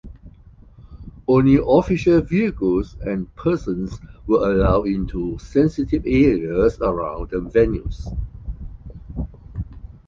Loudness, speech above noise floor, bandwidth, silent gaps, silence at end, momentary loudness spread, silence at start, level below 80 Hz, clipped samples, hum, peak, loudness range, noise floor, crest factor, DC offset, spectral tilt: -20 LUFS; 27 dB; 7.4 kHz; none; 0.2 s; 17 LU; 0.05 s; -32 dBFS; under 0.1%; none; -2 dBFS; 4 LU; -46 dBFS; 18 dB; under 0.1%; -8.5 dB/octave